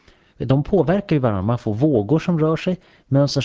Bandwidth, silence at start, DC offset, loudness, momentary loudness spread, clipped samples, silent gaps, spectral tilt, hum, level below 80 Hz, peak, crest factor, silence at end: 7.8 kHz; 0.4 s; under 0.1%; -19 LUFS; 6 LU; under 0.1%; none; -7.5 dB/octave; none; -44 dBFS; -4 dBFS; 14 dB; 0 s